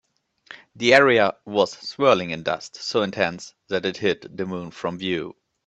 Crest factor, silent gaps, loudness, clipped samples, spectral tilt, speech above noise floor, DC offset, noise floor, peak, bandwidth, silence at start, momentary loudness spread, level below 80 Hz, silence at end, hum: 22 dB; none; -22 LUFS; under 0.1%; -4.5 dB/octave; 27 dB; under 0.1%; -49 dBFS; 0 dBFS; 8.4 kHz; 0.5 s; 14 LU; -64 dBFS; 0.35 s; none